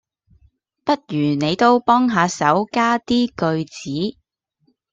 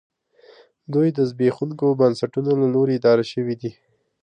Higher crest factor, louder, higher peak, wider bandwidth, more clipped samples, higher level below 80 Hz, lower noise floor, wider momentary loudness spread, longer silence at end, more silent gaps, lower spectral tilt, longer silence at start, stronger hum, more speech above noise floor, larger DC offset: about the same, 18 dB vs 16 dB; about the same, -19 LUFS vs -20 LUFS; about the same, -2 dBFS vs -4 dBFS; second, 8 kHz vs 9.6 kHz; neither; first, -56 dBFS vs -68 dBFS; first, -66 dBFS vs -52 dBFS; about the same, 10 LU vs 8 LU; first, 0.8 s vs 0.5 s; neither; second, -5.5 dB/octave vs -8 dB/octave; about the same, 0.85 s vs 0.9 s; neither; first, 48 dB vs 32 dB; neither